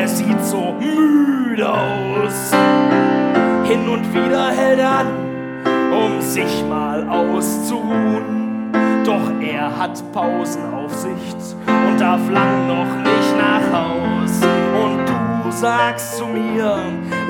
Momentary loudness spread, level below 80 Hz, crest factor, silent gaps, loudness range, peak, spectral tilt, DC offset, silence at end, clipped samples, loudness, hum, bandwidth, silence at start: 8 LU; -52 dBFS; 16 dB; none; 4 LU; -2 dBFS; -5.5 dB/octave; under 0.1%; 0 s; under 0.1%; -17 LUFS; none; 19 kHz; 0 s